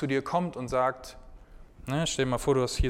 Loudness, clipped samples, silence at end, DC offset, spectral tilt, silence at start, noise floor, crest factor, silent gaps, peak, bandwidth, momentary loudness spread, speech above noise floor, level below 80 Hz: -29 LUFS; under 0.1%; 0 s; under 0.1%; -5 dB/octave; 0 s; -49 dBFS; 16 dB; none; -12 dBFS; 16.5 kHz; 17 LU; 21 dB; -40 dBFS